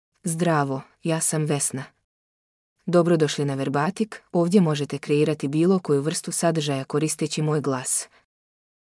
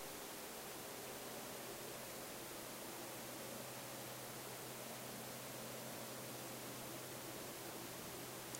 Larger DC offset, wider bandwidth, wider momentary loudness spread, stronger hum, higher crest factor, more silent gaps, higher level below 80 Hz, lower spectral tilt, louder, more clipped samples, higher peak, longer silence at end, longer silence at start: neither; second, 12 kHz vs 16 kHz; first, 8 LU vs 1 LU; neither; about the same, 18 dB vs 22 dB; first, 2.04-2.76 s vs none; about the same, -74 dBFS vs -76 dBFS; first, -5 dB/octave vs -2.5 dB/octave; first, -23 LUFS vs -49 LUFS; neither; first, -6 dBFS vs -28 dBFS; first, 0.9 s vs 0 s; first, 0.25 s vs 0 s